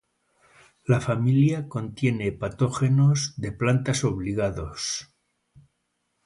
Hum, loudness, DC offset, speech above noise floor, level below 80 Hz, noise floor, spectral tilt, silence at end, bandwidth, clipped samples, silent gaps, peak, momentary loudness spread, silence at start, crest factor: none; -25 LUFS; under 0.1%; 52 dB; -50 dBFS; -75 dBFS; -6 dB/octave; 1.2 s; 11.5 kHz; under 0.1%; none; -6 dBFS; 10 LU; 0.9 s; 18 dB